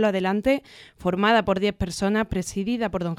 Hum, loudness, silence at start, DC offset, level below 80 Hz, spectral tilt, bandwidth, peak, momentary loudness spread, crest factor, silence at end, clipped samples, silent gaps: none; -24 LUFS; 0 s; under 0.1%; -44 dBFS; -5.5 dB/octave; 14.5 kHz; -6 dBFS; 7 LU; 18 dB; 0 s; under 0.1%; none